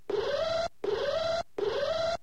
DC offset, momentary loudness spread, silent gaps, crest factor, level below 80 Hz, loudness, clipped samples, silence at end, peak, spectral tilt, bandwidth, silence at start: 0.4%; 2 LU; none; 10 dB; -56 dBFS; -31 LUFS; under 0.1%; 0.05 s; -20 dBFS; -4 dB/octave; 12 kHz; 0.1 s